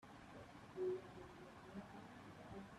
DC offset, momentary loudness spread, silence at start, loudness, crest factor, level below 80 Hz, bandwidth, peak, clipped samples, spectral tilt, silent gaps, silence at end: under 0.1%; 13 LU; 0 s; -53 LUFS; 16 dB; -74 dBFS; 13 kHz; -36 dBFS; under 0.1%; -6.5 dB/octave; none; 0 s